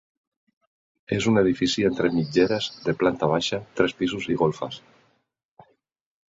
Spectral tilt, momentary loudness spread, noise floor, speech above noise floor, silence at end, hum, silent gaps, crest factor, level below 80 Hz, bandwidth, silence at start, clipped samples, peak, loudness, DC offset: -5.5 dB/octave; 7 LU; -65 dBFS; 42 dB; 1.5 s; none; none; 22 dB; -56 dBFS; 7.8 kHz; 1.1 s; under 0.1%; -4 dBFS; -23 LUFS; under 0.1%